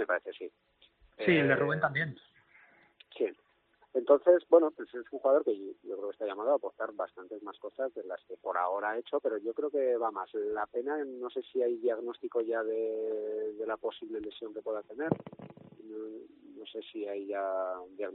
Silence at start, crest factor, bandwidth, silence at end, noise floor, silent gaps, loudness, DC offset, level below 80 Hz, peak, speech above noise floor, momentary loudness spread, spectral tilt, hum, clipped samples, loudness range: 0 s; 24 dB; 4.5 kHz; 0 s; -69 dBFS; none; -32 LUFS; under 0.1%; -76 dBFS; -10 dBFS; 37 dB; 18 LU; -4.5 dB/octave; none; under 0.1%; 10 LU